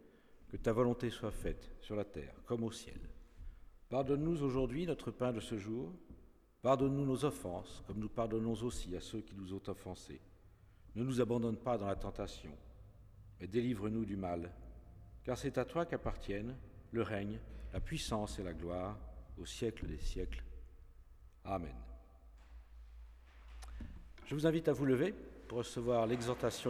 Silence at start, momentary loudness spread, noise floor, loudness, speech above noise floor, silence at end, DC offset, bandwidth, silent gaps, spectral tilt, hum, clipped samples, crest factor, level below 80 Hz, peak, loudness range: 0 s; 22 LU; -62 dBFS; -40 LUFS; 24 dB; 0 s; under 0.1%; 15.5 kHz; none; -6.5 dB/octave; none; under 0.1%; 20 dB; -52 dBFS; -20 dBFS; 8 LU